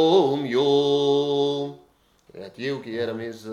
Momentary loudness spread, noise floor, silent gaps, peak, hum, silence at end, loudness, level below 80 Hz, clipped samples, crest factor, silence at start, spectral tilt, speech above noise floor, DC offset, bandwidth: 14 LU; -59 dBFS; none; -6 dBFS; none; 0 s; -23 LUFS; -70 dBFS; under 0.1%; 16 dB; 0 s; -6 dB/octave; 37 dB; under 0.1%; 10.5 kHz